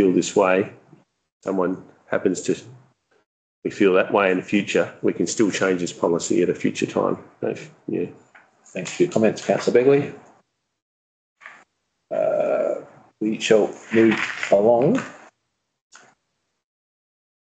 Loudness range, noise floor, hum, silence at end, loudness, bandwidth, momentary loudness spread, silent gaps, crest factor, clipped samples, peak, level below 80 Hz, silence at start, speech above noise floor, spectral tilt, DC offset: 4 LU; -75 dBFS; none; 2.45 s; -21 LUFS; 9.2 kHz; 13 LU; 1.32-1.40 s, 3.26-3.62 s, 10.82-11.36 s; 20 dB; under 0.1%; -4 dBFS; -68 dBFS; 0 s; 55 dB; -5 dB/octave; under 0.1%